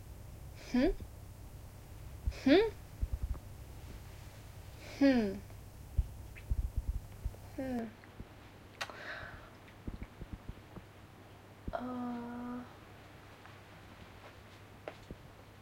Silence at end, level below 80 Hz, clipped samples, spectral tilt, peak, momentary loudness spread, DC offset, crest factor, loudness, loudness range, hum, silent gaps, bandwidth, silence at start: 0 s; -46 dBFS; under 0.1%; -6.5 dB/octave; -16 dBFS; 22 LU; under 0.1%; 24 dB; -37 LUFS; 13 LU; none; none; 16.5 kHz; 0 s